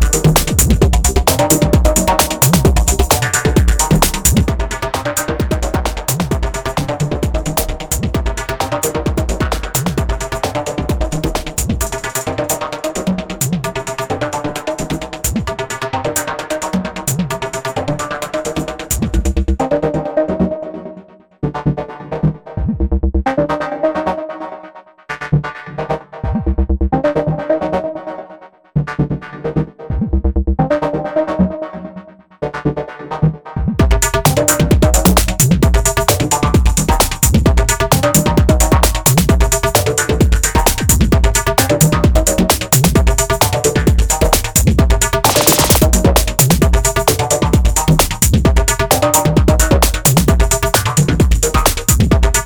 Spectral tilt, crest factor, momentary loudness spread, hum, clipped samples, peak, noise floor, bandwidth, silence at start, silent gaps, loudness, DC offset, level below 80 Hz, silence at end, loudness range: -4.5 dB/octave; 14 dB; 10 LU; none; under 0.1%; 0 dBFS; -39 dBFS; over 20 kHz; 0 s; none; -14 LUFS; under 0.1%; -20 dBFS; 0 s; 8 LU